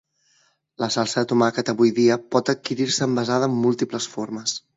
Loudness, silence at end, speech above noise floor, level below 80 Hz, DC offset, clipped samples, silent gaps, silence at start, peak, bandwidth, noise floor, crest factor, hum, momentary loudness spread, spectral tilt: -22 LUFS; 0.2 s; 42 dB; -66 dBFS; under 0.1%; under 0.1%; none; 0.8 s; -4 dBFS; 8 kHz; -64 dBFS; 18 dB; none; 8 LU; -4.5 dB/octave